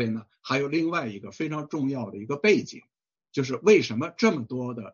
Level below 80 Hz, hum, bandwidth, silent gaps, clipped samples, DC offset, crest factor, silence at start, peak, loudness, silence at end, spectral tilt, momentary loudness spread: -70 dBFS; none; 7.2 kHz; none; under 0.1%; under 0.1%; 20 dB; 0 s; -6 dBFS; -26 LUFS; 0.05 s; -4.5 dB/octave; 13 LU